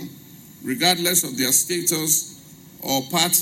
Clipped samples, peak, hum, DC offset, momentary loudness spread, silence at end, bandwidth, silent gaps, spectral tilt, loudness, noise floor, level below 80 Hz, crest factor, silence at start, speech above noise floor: under 0.1%; -4 dBFS; none; under 0.1%; 17 LU; 0 s; 16.5 kHz; none; -1.5 dB/octave; -19 LUFS; -44 dBFS; -64 dBFS; 18 dB; 0 s; 23 dB